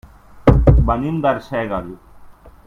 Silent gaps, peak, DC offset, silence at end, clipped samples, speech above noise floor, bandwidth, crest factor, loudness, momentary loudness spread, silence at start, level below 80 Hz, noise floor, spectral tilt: none; 0 dBFS; under 0.1%; 0.35 s; under 0.1%; 21 dB; 4.9 kHz; 18 dB; -17 LUFS; 12 LU; 0.35 s; -22 dBFS; -41 dBFS; -9.5 dB/octave